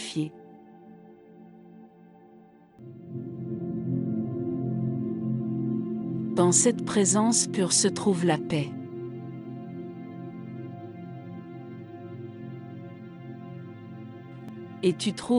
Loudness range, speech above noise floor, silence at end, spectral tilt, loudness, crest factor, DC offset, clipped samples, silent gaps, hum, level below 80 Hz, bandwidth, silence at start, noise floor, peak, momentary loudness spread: 18 LU; 29 dB; 0 s; -4.5 dB/octave; -27 LUFS; 20 dB; under 0.1%; under 0.1%; none; none; -66 dBFS; 12 kHz; 0 s; -54 dBFS; -10 dBFS; 20 LU